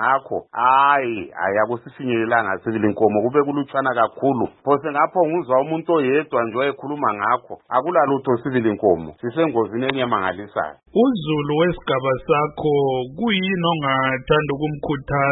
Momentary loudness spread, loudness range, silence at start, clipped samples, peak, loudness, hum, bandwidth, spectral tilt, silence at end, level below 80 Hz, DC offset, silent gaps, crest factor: 6 LU; 1 LU; 0 s; under 0.1%; 0 dBFS; -20 LUFS; none; 4.1 kHz; -11 dB/octave; 0 s; -50 dBFS; under 0.1%; none; 18 dB